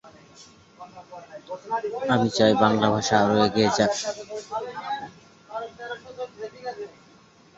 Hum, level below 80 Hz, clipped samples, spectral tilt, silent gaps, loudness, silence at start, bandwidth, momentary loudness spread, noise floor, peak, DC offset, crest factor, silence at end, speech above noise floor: none; -60 dBFS; under 0.1%; -4.5 dB/octave; none; -23 LUFS; 0.05 s; 8 kHz; 23 LU; -54 dBFS; -4 dBFS; under 0.1%; 22 dB; 0.7 s; 30 dB